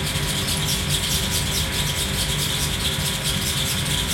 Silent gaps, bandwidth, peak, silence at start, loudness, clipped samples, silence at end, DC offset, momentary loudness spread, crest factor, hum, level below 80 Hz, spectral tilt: none; 16.5 kHz; -8 dBFS; 0 s; -21 LUFS; under 0.1%; 0 s; under 0.1%; 1 LU; 16 dB; none; -34 dBFS; -2.5 dB/octave